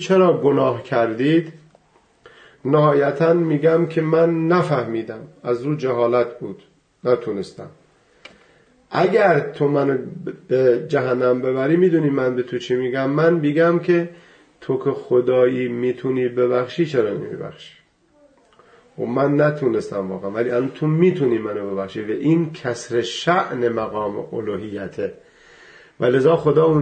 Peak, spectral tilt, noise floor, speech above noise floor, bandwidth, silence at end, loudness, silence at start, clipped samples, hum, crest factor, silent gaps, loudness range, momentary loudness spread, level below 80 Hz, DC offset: -4 dBFS; -7.5 dB/octave; -57 dBFS; 39 dB; 9 kHz; 0 s; -19 LUFS; 0 s; under 0.1%; none; 16 dB; none; 5 LU; 12 LU; -62 dBFS; under 0.1%